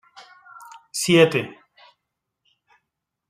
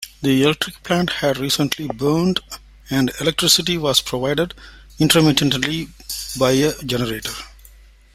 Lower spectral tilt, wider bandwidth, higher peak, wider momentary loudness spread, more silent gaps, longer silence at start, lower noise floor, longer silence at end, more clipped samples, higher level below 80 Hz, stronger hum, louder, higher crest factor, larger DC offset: about the same, -4.5 dB/octave vs -4 dB/octave; about the same, 15.5 kHz vs 16 kHz; second, -4 dBFS vs 0 dBFS; first, 27 LU vs 13 LU; neither; first, 0.55 s vs 0 s; first, -81 dBFS vs -46 dBFS; first, 1.75 s vs 0.65 s; neither; second, -68 dBFS vs -44 dBFS; neither; about the same, -19 LUFS vs -18 LUFS; about the same, 22 dB vs 20 dB; neither